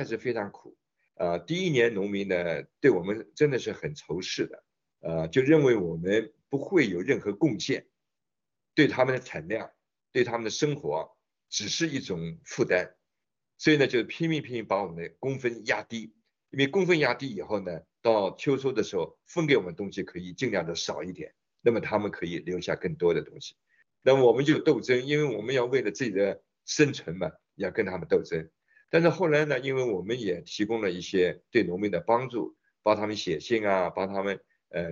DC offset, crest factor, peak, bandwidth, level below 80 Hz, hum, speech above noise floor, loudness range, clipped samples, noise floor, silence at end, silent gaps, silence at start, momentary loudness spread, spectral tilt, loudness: under 0.1%; 20 dB; -8 dBFS; 7.6 kHz; -66 dBFS; none; 63 dB; 4 LU; under 0.1%; -90 dBFS; 0 s; none; 0 s; 12 LU; -5.5 dB/octave; -28 LUFS